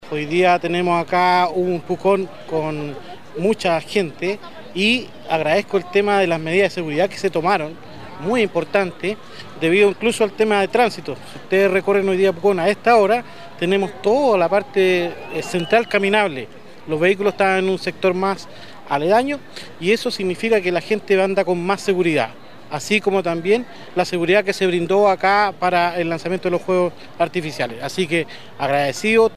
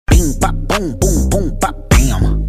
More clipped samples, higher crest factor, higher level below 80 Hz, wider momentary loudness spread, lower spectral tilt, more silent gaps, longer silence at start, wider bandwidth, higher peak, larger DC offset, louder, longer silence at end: neither; about the same, 16 dB vs 12 dB; second, -60 dBFS vs -16 dBFS; first, 11 LU vs 6 LU; about the same, -5 dB/octave vs -5 dB/octave; neither; about the same, 0 s vs 0.1 s; second, 14 kHz vs 15.5 kHz; about the same, -2 dBFS vs 0 dBFS; first, 1% vs under 0.1%; second, -19 LUFS vs -15 LUFS; about the same, 0 s vs 0 s